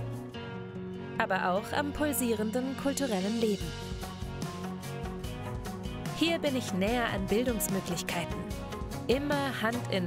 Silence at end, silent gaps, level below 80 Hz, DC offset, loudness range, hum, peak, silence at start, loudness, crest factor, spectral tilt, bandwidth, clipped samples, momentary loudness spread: 0 s; none; -48 dBFS; under 0.1%; 4 LU; none; -12 dBFS; 0 s; -32 LUFS; 20 dB; -4.5 dB/octave; 16 kHz; under 0.1%; 10 LU